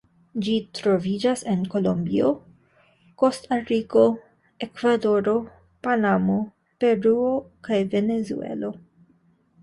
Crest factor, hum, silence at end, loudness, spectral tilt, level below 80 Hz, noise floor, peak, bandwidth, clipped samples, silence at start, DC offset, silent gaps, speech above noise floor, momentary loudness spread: 18 dB; none; 0.85 s; -23 LUFS; -6.5 dB/octave; -60 dBFS; -61 dBFS; -6 dBFS; 11.5 kHz; under 0.1%; 0.35 s; under 0.1%; none; 39 dB; 12 LU